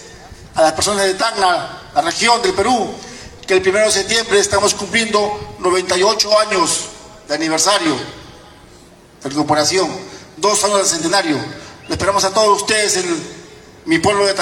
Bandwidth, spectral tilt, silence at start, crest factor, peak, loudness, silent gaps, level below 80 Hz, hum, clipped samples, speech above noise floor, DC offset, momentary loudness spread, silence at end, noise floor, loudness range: 17.5 kHz; -2 dB/octave; 0 s; 16 dB; 0 dBFS; -15 LUFS; none; -46 dBFS; none; under 0.1%; 28 dB; under 0.1%; 12 LU; 0 s; -43 dBFS; 3 LU